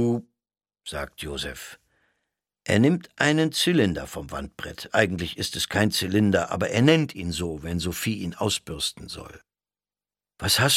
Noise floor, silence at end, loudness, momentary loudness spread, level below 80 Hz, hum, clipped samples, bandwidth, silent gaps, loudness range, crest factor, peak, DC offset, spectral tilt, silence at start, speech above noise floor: under -90 dBFS; 0 s; -24 LUFS; 15 LU; -48 dBFS; 50 Hz at -50 dBFS; under 0.1%; 16.5 kHz; none; 5 LU; 24 dB; -2 dBFS; under 0.1%; -4.5 dB/octave; 0 s; over 66 dB